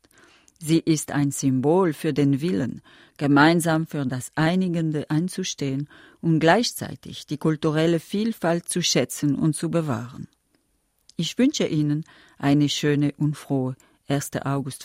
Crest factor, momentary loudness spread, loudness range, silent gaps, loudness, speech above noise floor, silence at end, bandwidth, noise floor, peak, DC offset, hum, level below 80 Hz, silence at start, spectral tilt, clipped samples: 20 dB; 12 LU; 3 LU; none; -23 LUFS; 46 dB; 0 s; 16 kHz; -69 dBFS; -4 dBFS; under 0.1%; none; -60 dBFS; 0.6 s; -5.5 dB/octave; under 0.1%